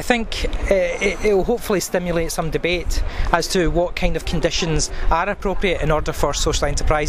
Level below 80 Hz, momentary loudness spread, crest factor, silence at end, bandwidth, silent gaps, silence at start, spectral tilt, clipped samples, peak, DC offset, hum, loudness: -24 dBFS; 4 LU; 18 dB; 0 s; 15.5 kHz; none; 0 s; -4 dB/octave; under 0.1%; 0 dBFS; under 0.1%; none; -20 LUFS